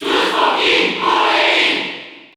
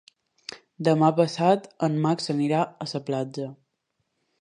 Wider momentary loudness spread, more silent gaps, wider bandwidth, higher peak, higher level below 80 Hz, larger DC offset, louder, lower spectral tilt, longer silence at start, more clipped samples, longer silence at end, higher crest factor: second, 8 LU vs 19 LU; neither; first, over 20 kHz vs 10.5 kHz; first, -2 dBFS vs -6 dBFS; first, -58 dBFS vs -72 dBFS; neither; first, -13 LUFS vs -24 LUFS; second, -2 dB/octave vs -6.5 dB/octave; second, 0 s vs 0.5 s; neither; second, 0.15 s vs 0.85 s; second, 14 dB vs 20 dB